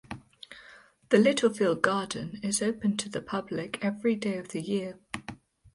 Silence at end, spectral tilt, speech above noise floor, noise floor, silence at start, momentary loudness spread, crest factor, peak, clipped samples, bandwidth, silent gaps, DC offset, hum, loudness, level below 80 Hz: 0.4 s; -4.5 dB/octave; 27 dB; -55 dBFS; 0.1 s; 21 LU; 24 dB; -6 dBFS; under 0.1%; 11.5 kHz; none; under 0.1%; none; -28 LUFS; -64 dBFS